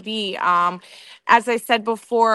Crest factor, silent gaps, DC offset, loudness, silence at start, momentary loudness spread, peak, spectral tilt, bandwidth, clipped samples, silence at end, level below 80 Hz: 18 dB; none; under 0.1%; -19 LUFS; 0.05 s; 10 LU; -2 dBFS; -3.5 dB/octave; 12.5 kHz; under 0.1%; 0 s; -70 dBFS